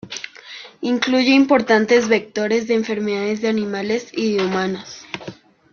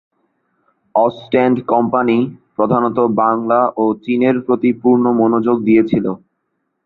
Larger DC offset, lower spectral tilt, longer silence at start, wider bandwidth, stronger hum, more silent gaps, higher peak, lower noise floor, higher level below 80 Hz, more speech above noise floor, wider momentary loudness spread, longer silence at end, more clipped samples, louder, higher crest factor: neither; second, -4.5 dB/octave vs -10 dB/octave; second, 0.05 s vs 0.95 s; first, 7 kHz vs 4.2 kHz; neither; neither; about the same, -2 dBFS vs -2 dBFS; second, -39 dBFS vs -70 dBFS; second, -62 dBFS vs -56 dBFS; second, 21 dB vs 56 dB; first, 18 LU vs 6 LU; second, 0.4 s vs 0.7 s; neither; second, -18 LUFS vs -15 LUFS; about the same, 18 dB vs 14 dB